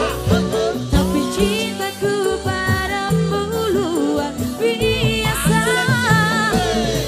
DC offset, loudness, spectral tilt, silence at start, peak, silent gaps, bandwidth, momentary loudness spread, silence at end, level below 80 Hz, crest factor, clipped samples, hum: under 0.1%; -18 LUFS; -5 dB/octave; 0 s; -2 dBFS; none; 15.5 kHz; 5 LU; 0 s; -32 dBFS; 16 dB; under 0.1%; none